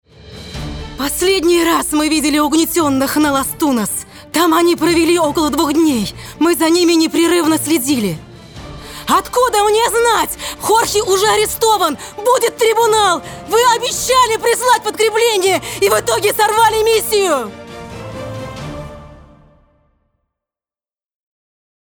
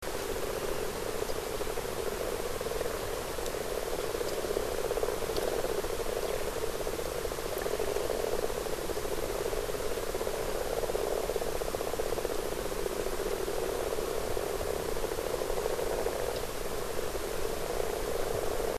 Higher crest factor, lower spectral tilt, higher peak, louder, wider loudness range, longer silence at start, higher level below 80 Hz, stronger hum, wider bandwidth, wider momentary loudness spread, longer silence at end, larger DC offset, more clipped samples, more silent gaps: about the same, 14 dB vs 18 dB; about the same, -3 dB/octave vs -3.5 dB/octave; first, -2 dBFS vs -14 dBFS; first, -14 LUFS vs -34 LUFS; first, 4 LU vs 1 LU; first, 0.2 s vs 0 s; about the same, -42 dBFS vs -42 dBFS; neither; first, over 20 kHz vs 14 kHz; first, 15 LU vs 3 LU; first, 2.75 s vs 0 s; neither; neither; neither